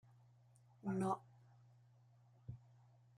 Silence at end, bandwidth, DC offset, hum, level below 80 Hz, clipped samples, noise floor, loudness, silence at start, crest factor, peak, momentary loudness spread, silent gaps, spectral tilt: 0.6 s; 11.5 kHz; under 0.1%; none; -80 dBFS; under 0.1%; -69 dBFS; -45 LUFS; 0.85 s; 22 dB; -28 dBFS; 24 LU; none; -8 dB/octave